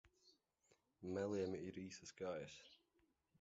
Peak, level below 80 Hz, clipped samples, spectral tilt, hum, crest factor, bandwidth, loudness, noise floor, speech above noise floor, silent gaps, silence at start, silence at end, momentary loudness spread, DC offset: -32 dBFS; -74 dBFS; under 0.1%; -5.5 dB/octave; none; 18 dB; 7.6 kHz; -48 LUFS; -83 dBFS; 35 dB; none; 0.05 s; 0.65 s; 14 LU; under 0.1%